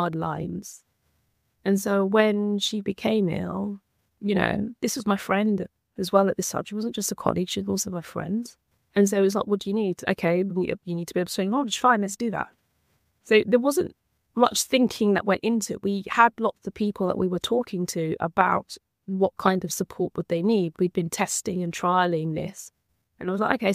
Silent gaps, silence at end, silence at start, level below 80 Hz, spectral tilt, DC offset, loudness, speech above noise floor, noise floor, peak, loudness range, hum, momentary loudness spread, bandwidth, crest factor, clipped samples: none; 0 s; 0 s; -60 dBFS; -5 dB/octave; under 0.1%; -25 LUFS; 47 dB; -71 dBFS; -2 dBFS; 3 LU; none; 11 LU; 15.5 kHz; 22 dB; under 0.1%